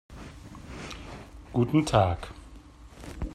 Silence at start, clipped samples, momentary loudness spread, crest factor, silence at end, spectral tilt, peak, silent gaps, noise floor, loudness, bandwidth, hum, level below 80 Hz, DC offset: 0.1 s; under 0.1%; 23 LU; 22 dB; 0 s; -6.5 dB/octave; -8 dBFS; none; -49 dBFS; -27 LUFS; 13 kHz; none; -44 dBFS; under 0.1%